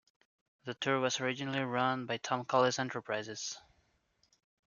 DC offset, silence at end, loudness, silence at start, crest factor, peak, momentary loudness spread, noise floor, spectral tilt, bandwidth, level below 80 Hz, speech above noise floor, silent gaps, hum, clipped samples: under 0.1%; 1.2 s; -34 LUFS; 0.65 s; 22 dB; -14 dBFS; 12 LU; -75 dBFS; -4 dB/octave; 7.4 kHz; -80 dBFS; 41 dB; none; none; under 0.1%